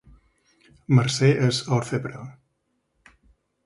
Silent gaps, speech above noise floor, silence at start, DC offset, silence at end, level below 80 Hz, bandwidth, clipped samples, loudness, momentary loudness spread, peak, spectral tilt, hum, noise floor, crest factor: none; 52 dB; 0.9 s; under 0.1%; 1.35 s; -58 dBFS; 11.5 kHz; under 0.1%; -22 LUFS; 19 LU; -6 dBFS; -6 dB/octave; none; -73 dBFS; 20 dB